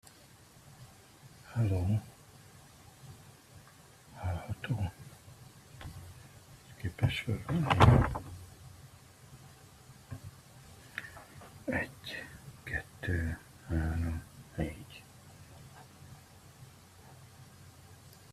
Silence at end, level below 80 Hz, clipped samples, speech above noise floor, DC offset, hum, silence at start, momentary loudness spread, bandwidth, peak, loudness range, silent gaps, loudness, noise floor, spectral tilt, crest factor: 0.25 s; -48 dBFS; under 0.1%; 29 dB; under 0.1%; none; 0.8 s; 23 LU; 14.5 kHz; -6 dBFS; 16 LU; none; -33 LUFS; -58 dBFS; -6.5 dB/octave; 30 dB